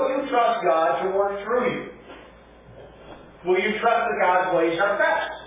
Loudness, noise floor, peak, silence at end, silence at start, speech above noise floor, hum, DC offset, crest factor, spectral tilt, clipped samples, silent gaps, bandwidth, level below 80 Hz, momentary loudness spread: -22 LUFS; -48 dBFS; -8 dBFS; 0 s; 0 s; 26 dB; none; under 0.1%; 16 dB; -8.5 dB/octave; under 0.1%; none; 3.9 kHz; -56 dBFS; 5 LU